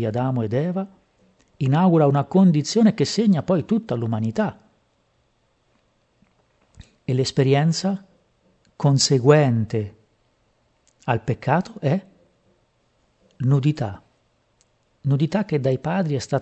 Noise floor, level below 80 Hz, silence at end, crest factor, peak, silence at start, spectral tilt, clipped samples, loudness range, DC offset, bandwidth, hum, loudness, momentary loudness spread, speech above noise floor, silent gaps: -65 dBFS; -60 dBFS; 0 s; 20 dB; -2 dBFS; 0 s; -6.5 dB/octave; under 0.1%; 8 LU; under 0.1%; 8.6 kHz; none; -21 LUFS; 11 LU; 46 dB; none